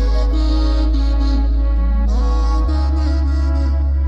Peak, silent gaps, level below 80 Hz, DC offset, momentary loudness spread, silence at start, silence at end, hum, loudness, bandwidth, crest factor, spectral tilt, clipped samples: -6 dBFS; none; -14 dBFS; under 0.1%; 1 LU; 0 s; 0 s; none; -18 LUFS; 6.6 kHz; 8 dB; -8 dB/octave; under 0.1%